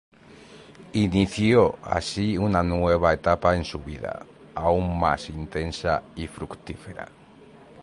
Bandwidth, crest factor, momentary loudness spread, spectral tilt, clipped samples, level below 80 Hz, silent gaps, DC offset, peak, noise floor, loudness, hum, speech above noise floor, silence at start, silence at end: 11.5 kHz; 20 dB; 17 LU; -6.5 dB/octave; under 0.1%; -40 dBFS; none; under 0.1%; -4 dBFS; -49 dBFS; -24 LUFS; none; 26 dB; 0.3 s; 0 s